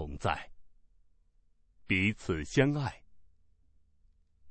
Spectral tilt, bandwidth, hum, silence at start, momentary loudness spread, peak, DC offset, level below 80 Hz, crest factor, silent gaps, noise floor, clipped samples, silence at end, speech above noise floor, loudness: -6 dB/octave; 8.4 kHz; none; 0 s; 9 LU; -12 dBFS; under 0.1%; -52 dBFS; 24 dB; none; -68 dBFS; under 0.1%; 0 s; 38 dB; -31 LUFS